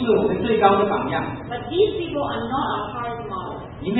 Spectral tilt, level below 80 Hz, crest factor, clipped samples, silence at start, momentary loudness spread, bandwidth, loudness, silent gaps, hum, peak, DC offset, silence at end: -11 dB/octave; -46 dBFS; 22 dB; under 0.1%; 0 s; 13 LU; 4.1 kHz; -22 LUFS; none; none; 0 dBFS; under 0.1%; 0 s